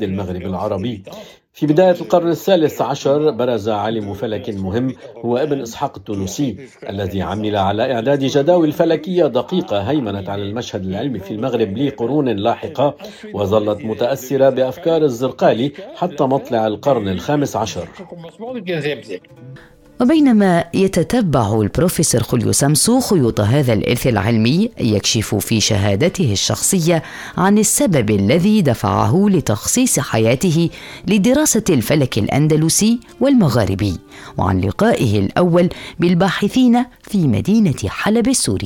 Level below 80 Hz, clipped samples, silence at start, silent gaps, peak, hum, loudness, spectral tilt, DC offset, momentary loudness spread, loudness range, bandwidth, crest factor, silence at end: -44 dBFS; under 0.1%; 0 s; none; 0 dBFS; none; -16 LUFS; -5 dB/octave; under 0.1%; 10 LU; 5 LU; 18.5 kHz; 16 dB; 0 s